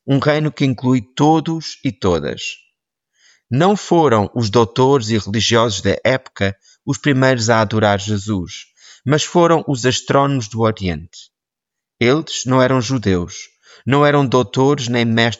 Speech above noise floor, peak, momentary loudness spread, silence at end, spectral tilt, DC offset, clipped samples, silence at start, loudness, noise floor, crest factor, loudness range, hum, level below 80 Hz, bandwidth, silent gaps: 67 dB; -2 dBFS; 10 LU; 0.05 s; -5.5 dB/octave; under 0.1%; under 0.1%; 0.05 s; -16 LUFS; -83 dBFS; 16 dB; 3 LU; none; -48 dBFS; 8 kHz; none